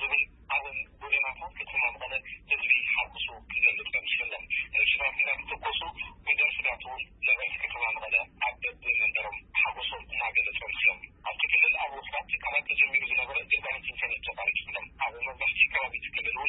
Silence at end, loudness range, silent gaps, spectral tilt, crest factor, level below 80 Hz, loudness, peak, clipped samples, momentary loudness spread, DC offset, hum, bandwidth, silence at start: 0 s; 2 LU; none; -5 dB/octave; 20 dB; -56 dBFS; -27 LUFS; -10 dBFS; under 0.1%; 10 LU; under 0.1%; none; 4.1 kHz; 0 s